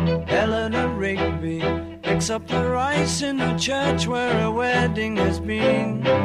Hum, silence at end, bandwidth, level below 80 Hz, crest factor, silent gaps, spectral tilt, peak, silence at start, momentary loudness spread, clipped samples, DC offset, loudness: none; 0 s; 12 kHz; -40 dBFS; 14 dB; none; -5 dB/octave; -8 dBFS; 0 s; 4 LU; under 0.1%; under 0.1%; -22 LUFS